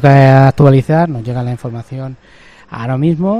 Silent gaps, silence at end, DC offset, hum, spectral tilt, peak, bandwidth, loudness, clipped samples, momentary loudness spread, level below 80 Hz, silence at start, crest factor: none; 0 s; under 0.1%; none; -9 dB/octave; 0 dBFS; 6.6 kHz; -11 LUFS; 0.7%; 19 LU; -40 dBFS; 0 s; 12 dB